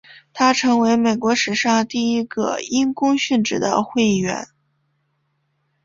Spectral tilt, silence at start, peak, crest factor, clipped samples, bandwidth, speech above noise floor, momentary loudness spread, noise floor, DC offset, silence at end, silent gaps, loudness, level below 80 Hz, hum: -4 dB/octave; 0.35 s; -2 dBFS; 18 dB; under 0.1%; 7.6 kHz; 51 dB; 7 LU; -69 dBFS; under 0.1%; 1.4 s; none; -19 LUFS; -60 dBFS; none